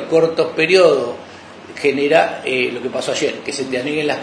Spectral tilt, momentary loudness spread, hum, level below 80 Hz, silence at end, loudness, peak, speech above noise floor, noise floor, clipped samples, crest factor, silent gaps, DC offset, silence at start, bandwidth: -4 dB/octave; 16 LU; none; -64 dBFS; 0 s; -17 LUFS; 0 dBFS; 20 dB; -36 dBFS; under 0.1%; 18 dB; none; under 0.1%; 0 s; 10.5 kHz